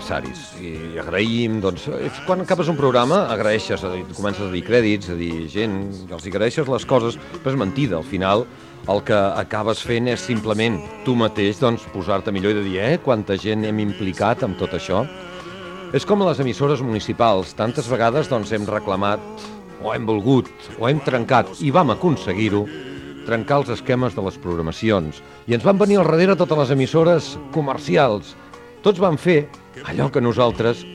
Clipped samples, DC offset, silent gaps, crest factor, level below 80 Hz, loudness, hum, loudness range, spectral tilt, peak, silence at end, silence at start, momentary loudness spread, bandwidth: under 0.1%; under 0.1%; none; 18 dB; -48 dBFS; -20 LUFS; none; 4 LU; -6.5 dB/octave; -2 dBFS; 0 s; 0 s; 12 LU; 12.5 kHz